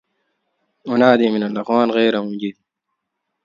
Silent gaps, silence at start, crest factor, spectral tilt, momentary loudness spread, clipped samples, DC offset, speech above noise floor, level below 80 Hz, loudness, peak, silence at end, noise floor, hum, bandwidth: none; 0.85 s; 18 dB; -7 dB/octave; 14 LU; under 0.1%; under 0.1%; 61 dB; -66 dBFS; -17 LUFS; 0 dBFS; 0.95 s; -77 dBFS; none; 7.2 kHz